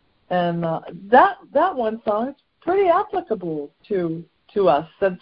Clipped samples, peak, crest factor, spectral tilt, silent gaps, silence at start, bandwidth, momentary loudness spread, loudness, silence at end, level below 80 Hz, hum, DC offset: under 0.1%; -2 dBFS; 20 dB; -11 dB/octave; none; 0.3 s; 5.4 kHz; 14 LU; -21 LUFS; 0.05 s; -58 dBFS; none; under 0.1%